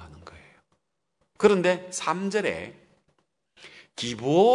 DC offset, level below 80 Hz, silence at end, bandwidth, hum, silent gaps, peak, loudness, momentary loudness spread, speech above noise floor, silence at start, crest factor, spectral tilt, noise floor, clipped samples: under 0.1%; -64 dBFS; 0 s; 11 kHz; none; none; -6 dBFS; -25 LUFS; 21 LU; 52 dB; 0 s; 20 dB; -5 dB/octave; -75 dBFS; under 0.1%